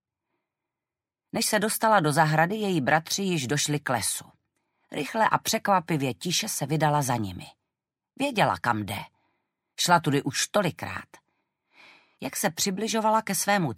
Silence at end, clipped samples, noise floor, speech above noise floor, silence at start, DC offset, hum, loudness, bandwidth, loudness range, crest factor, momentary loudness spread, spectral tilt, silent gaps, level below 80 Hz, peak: 0 s; under 0.1%; -90 dBFS; 65 dB; 1.35 s; under 0.1%; none; -25 LUFS; 16 kHz; 4 LU; 22 dB; 13 LU; -3.5 dB/octave; none; -68 dBFS; -4 dBFS